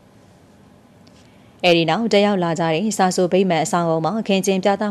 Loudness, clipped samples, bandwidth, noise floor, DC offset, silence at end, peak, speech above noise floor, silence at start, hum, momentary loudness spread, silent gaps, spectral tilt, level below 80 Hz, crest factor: -18 LUFS; under 0.1%; 14 kHz; -49 dBFS; under 0.1%; 0 s; -4 dBFS; 32 dB; 1.65 s; none; 4 LU; none; -5 dB/octave; -62 dBFS; 16 dB